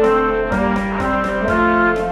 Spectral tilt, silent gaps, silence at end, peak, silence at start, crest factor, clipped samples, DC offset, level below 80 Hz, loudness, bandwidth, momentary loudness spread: -7 dB/octave; none; 0 s; -4 dBFS; 0 s; 12 dB; under 0.1%; under 0.1%; -32 dBFS; -17 LUFS; 12 kHz; 4 LU